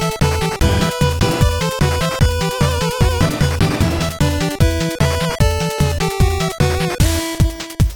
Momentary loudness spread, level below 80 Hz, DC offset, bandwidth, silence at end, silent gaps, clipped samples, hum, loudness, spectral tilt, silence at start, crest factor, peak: 2 LU; -22 dBFS; under 0.1%; 20 kHz; 0 s; none; under 0.1%; none; -17 LUFS; -5 dB/octave; 0 s; 16 dB; 0 dBFS